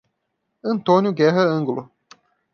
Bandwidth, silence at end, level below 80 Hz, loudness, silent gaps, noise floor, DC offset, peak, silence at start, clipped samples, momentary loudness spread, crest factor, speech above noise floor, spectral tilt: 6.8 kHz; 0.7 s; -70 dBFS; -19 LUFS; none; -75 dBFS; under 0.1%; -4 dBFS; 0.65 s; under 0.1%; 13 LU; 18 dB; 57 dB; -7.5 dB/octave